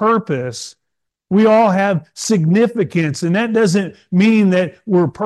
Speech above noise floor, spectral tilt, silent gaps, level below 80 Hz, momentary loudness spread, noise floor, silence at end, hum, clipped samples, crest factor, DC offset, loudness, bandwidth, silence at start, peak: 63 dB; -6.5 dB/octave; none; -60 dBFS; 9 LU; -77 dBFS; 0 s; none; under 0.1%; 12 dB; under 0.1%; -15 LUFS; 12.5 kHz; 0 s; -2 dBFS